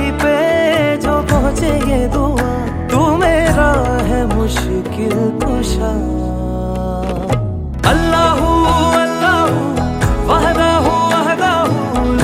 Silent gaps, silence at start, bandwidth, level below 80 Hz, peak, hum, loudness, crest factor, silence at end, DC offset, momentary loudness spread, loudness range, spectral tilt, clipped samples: none; 0 s; 16 kHz; -22 dBFS; 0 dBFS; none; -14 LUFS; 14 dB; 0 s; under 0.1%; 7 LU; 4 LU; -6 dB/octave; under 0.1%